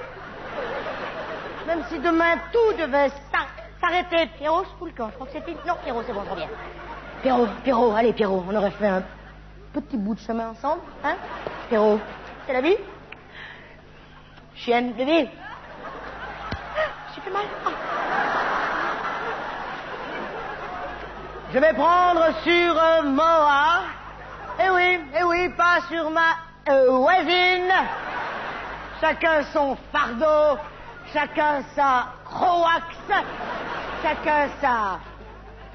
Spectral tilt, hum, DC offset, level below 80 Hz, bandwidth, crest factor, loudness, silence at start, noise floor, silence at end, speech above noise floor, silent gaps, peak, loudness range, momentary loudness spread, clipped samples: -5 dB/octave; 50 Hz at -50 dBFS; under 0.1%; -48 dBFS; 6.4 kHz; 16 dB; -23 LUFS; 0 s; -46 dBFS; 0 s; 25 dB; none; -6 dBFS; 8 LU; 17 LU; under 0.1%